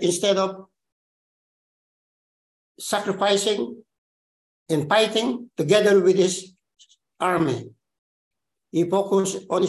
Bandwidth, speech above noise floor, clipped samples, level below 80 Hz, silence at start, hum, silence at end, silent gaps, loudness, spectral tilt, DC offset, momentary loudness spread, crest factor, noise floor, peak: 12.5 kHz; over 69 dB; under 0.1%; -68 dBFS; 0 s; none; 0 s; 0.92-2.75 s, 3.98-4.66 s, 7.98-8.31 s; -22 LUFS; -4 dB/octave; under 0.1%; 11 LU; 20 dB; under -90 dBFS; -4 dBFS